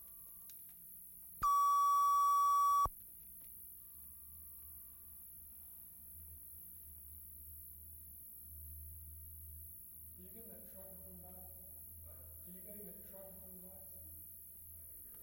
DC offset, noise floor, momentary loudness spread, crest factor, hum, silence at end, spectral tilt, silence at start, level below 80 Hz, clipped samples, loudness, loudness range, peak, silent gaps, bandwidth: under 0.1%; -55 dBFS; 21 LU; 16 dB; none; 0 s; -3 dB/octave; 0 s; -64 dBFS; under 0.1%; -37 LUFS; 17 LU; -26 dBFS; none; 16.5 kHz